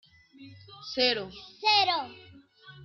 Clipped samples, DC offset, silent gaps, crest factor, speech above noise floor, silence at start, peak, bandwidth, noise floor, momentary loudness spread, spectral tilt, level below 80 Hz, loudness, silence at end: under 0.1%; under 0.1%; none; 20 dB; 23 dB; 0.4 s; -10 dBFS; 6.8 kHz; -52 dBFS; 21 LU; -3 dB/octave; -68 dBFS; -26 LUFS; 0 s